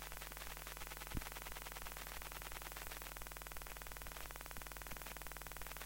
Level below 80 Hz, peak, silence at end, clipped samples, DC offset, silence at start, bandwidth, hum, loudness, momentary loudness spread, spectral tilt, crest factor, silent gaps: -56 dBFS; -30 dBFS; 0 s; under 0.1%; under 0.1%; 0 s; 17 kHz; none; -49 LUFS; 2 LU; -2.5 dB/octave; 20 dB; none